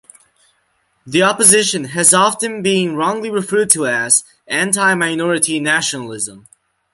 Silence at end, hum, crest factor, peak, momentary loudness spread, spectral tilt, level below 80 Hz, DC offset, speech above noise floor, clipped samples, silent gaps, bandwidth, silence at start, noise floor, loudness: 0.55 s; none; 16 dB; 0 dBFS; 11 LU; -2 dB/octave; -60 dBFS; under 0.1%; 47 dB; under 0.1%; none; 16 kHz; 1.05 s; -63 dBFS; -14 LUFS